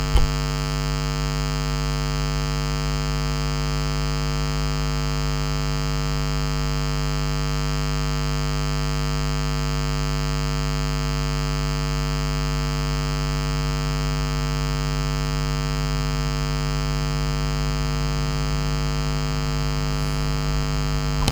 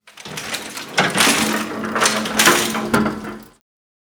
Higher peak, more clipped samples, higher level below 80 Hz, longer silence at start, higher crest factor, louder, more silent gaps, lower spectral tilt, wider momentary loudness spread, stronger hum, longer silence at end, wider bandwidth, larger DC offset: about the same, 0 dBFS vs 0 dBFS; neither; first, -26 dBFS vs -50 dBFS; about the same, 0 s vs 0.05 s; about the same, 22 dB vs 20 dB; second, -24 LUFS vs -17 LUFS; neither; first, -5 dB/octave vs -2 dB/octave; second, 0 LU vs 17 LU; first, 50 Hz at -25 dBFS vs none; second, 0 s vs 0.55 s; about the same, over 20 kHz vs over 20 kHz; neither